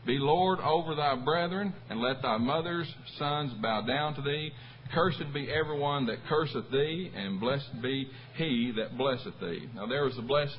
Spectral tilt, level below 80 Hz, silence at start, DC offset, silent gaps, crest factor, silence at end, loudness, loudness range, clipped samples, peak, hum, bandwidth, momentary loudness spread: -10 dB/octave; -60 dBFS; 0 s; under 0.1%; none; 20 dB; 0 s; -31 LUFS; 2 LU; under 0.1%; -12 dBFS; none; 5.8 kHz; 7 LU